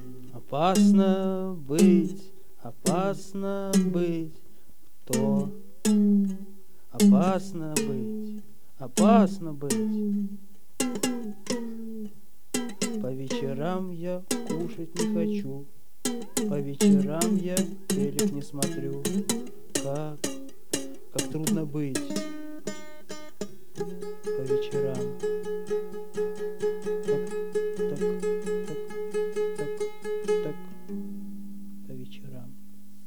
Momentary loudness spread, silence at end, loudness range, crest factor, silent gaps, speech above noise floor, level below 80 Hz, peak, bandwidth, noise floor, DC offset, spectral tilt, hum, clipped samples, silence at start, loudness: 19 LU; 0.35 s; 8 LU; 22 dB; none; 33 dB; -68 dBFS; -6 dBFS; 19.5 kHz; -59 dBFS; 2%; -5.5 dB/octave; none; under 0.1%; 0 s; -28 LUFS